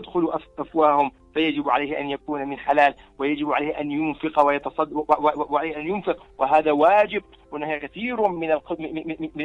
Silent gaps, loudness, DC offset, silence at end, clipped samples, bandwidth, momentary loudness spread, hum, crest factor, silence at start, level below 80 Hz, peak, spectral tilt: none; -23 LUFS; under 0.1%; 0 s; under 0.1%; 7.4 kHz; 10 LU; none; 20 dB; 0 s; -56 dBFS; -4 dBFS; -7 dB/octave